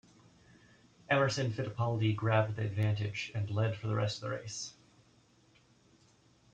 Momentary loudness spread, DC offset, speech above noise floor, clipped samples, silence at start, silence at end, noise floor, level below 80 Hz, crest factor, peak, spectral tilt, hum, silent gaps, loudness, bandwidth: 9 LU; under 0.1%; 33 dB; under 0.1%; 1.1 s; 1.85 s; -66 dBFS; -68 dBFS; 18 dB; -16 dBFS; -5.5 dB/octave; none; none; -34 LUFS; 8.8 kHz